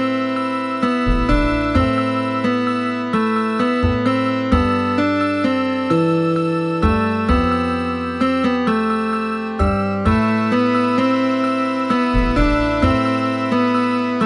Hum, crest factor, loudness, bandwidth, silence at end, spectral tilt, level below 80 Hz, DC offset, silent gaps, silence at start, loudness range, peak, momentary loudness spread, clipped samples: none; 16 dB; -18 LUFS; 9.8 kHz; 0 s; -7 dB/octave; -28 dBFS; under 0.1%; none; 0 s; 1 LU; -2 dBFS; 3 LU; under 0.1%